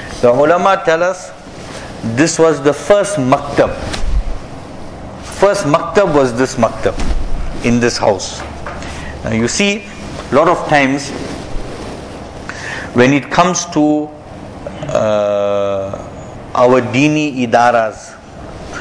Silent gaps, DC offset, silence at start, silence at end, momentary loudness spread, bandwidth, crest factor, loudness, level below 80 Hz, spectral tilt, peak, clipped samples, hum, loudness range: none; under 0.1%; 0 s; 0 s; 18 LU; 11 kHz; 14 dB; -14 LUFS; -28 dBFS; -5 dB/octave; 0 dBFS; under 0.1%; none; 3 LU